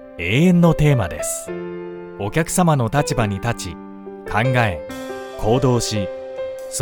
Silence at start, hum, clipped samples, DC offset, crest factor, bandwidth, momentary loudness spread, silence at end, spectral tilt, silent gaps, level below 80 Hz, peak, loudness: 0 s; none; under 0.1%; under 0.1%; 18 dB; 19 kHz; 16 LU; 0 s; -5.5 dB/octave; none; -38 dBFS; -2 dBFS; -19 LUFS